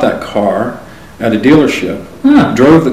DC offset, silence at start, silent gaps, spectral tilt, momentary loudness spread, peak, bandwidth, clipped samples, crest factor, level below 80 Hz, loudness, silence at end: 1%; 0 s; none; -6.5 dB/octave; 12 LU; 0 dBFS; 14.5 kHz; 0.7%; 10 dB; -38 dBFS; -10 LUFS; 0 s